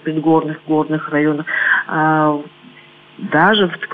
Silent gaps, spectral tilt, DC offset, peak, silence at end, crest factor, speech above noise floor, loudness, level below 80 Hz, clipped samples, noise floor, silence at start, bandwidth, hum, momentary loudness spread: none; -9 dB/octave; under 0.1%; -2 dBFS; 0 s; 16 dB; 28 dB; -16 LUFS; -62 dBFS; under 0.1%; -43 dBFS; 0.05 s; 4.5 kHz; none; 6 LU